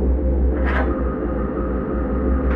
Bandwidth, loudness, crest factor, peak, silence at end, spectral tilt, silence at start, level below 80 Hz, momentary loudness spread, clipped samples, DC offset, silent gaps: 3.7 kHz; -22 LUFS; 12 dB; -8 dBFS; 0 s; -11 dB/octave; 0 s; -22 dBFS; 3 LU; under 0.1%; under 0.1%; none